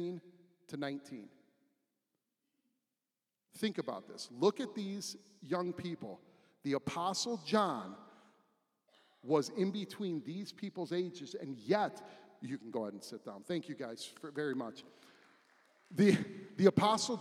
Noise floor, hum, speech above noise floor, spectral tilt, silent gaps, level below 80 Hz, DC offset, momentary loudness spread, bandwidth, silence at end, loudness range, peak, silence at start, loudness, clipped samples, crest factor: under -90 dBFS; none; over 54 dB; -5 dB/octave; none; -84 dBFS; under 0.1%; 19 LU; 14.5 kHz; 0 s; 8 LU; -12 dBFS; 0 s; -37 LUFS; under 0.1%; 26 dB